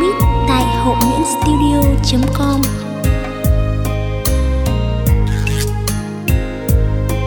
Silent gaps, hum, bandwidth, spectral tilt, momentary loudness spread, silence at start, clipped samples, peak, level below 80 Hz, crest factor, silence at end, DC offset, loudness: none; none; over 20 kHz; -6 dB/octave; 5 LU; 0 s; under 0.1%; 0 dBFS; -18 dBFS; 14 dB; 0 s; under 0.1%; -16 LUFS